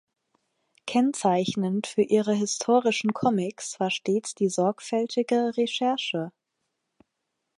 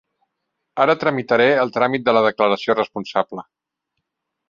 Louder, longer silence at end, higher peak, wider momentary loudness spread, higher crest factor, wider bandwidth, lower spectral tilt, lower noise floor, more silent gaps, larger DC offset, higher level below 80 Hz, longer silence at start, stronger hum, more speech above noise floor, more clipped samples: second, -25 LUFS vs -18 LUFS; first, 1.3 s vs 1.1 s; second, -8 dBFS vs -2 dBFS; about the same, 6 LU vs 8 LU; about the same, 18 dB vs 18 dB; first, 11.5 kHz vs 7.2 kHz; second, -4.5 dB/octave vs -6 dB/octave; about the same, -81 dBFS vs -78 dBFS; neither; neither; second, -74 dBFS vs -64 dBFS; about the same, 0.85 s vs 0.75 s; neither; second, 56 dB vs 60 dB; neither